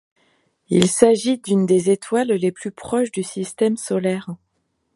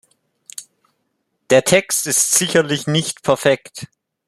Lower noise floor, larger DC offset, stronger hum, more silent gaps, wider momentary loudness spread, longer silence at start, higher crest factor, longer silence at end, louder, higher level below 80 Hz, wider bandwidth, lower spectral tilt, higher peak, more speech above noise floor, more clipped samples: about the same, -70 dBFS vs -70 dBFS; neither; neither; neither; second, 12 LU vs 21 LU; about the same, 0.7 s vs 0.6 s; about the same, 20 dB vs 18 dB; first, 0.6 s vs 0.4 s; second, -19 LUFS vs -16 LUFS; about the same, -60 dBFS vs -58 dBFS; second, 11.5 kHz vs 14 kHz; first, -5.5 dB/octave vs -3 dB/octave; about the same, 0 dBFS vs -2 dBFS; about the same, 52 dB vs 54 dB; neither